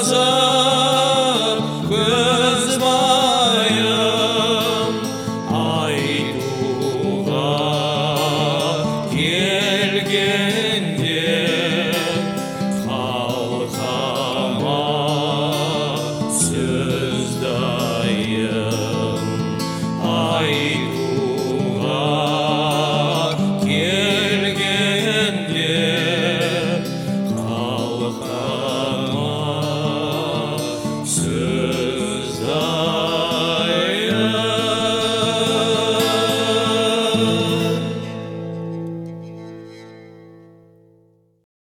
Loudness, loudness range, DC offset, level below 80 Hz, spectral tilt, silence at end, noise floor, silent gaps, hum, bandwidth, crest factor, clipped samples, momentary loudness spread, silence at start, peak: -19 LUFS; 6 LU; under 0.1%; -52 dBFS; -4 dB/octave; 1.4 s; -56 dBFS; none; none; 19 kHz; 16 dB; under 0.1%; 8 LU; 0 s; -4 dBFS